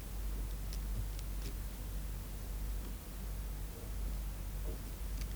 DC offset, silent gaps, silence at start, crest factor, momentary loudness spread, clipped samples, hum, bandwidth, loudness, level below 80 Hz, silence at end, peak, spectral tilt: under 0.1%; none; 0 s; 14 dB; 3 LU; under 0.1%; none; over 20 kHz; -44 LUFS; -42 dBFS; 0 s; -26 dBFS; -5 dB/octave